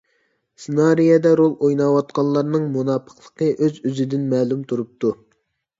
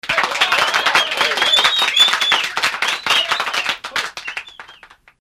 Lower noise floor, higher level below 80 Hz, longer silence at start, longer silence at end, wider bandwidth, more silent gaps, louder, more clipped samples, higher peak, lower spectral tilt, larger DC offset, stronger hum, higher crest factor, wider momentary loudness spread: first, -68 dBFS vs -45 dBFS; second, -66 dBFS vs -56 dBFS; first, 0.6 s vs 0.05 s; first, 0.65 s vs 0.5 s; second, 7.8 kHz vs 16 kHz; neither; second, -19 LUFS vs -15 LUFS; neither; second, -4 dBFS vs 0 dBFS; first, -8 dB/octave vs 0.5 dB/octave; neither; neither; about the same, 16 dB vs 18 dB; about the same, 10 LU vs 11 LU